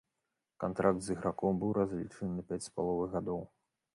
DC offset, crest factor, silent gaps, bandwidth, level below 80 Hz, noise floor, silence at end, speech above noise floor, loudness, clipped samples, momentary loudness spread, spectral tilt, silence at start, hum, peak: under 0.1%; 20 dB; none; 11.5 kHz; -60 dBFS; -87 dBFS; 0.5 s; 52 dB; -35 LUFS; under 0.1%; 8 LU; -7 dB/octave; 0.6 s; none; -16 dBFS